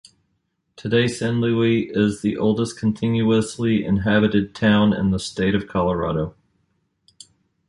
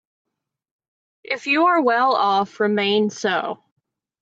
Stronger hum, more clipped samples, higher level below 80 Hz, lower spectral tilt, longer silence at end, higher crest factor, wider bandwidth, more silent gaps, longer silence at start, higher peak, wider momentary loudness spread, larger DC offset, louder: neither; neither; first, -44 dBFS vs -76 dBFS; first, -6.5 dB/octave vs -4.5 dB/octave; first, 1.4 s vs 0.65 s; about the same, 16 dB vs 16 dB; first, 11.5 kHz vs 8 kHz; neither; second, 0.8 s vs 1.3 s; about the same, -6 dBFS vs -6 dBFS; second, 5 LU vs 11 LU; neither; about the same, -20 LUFS vs -19 LUFS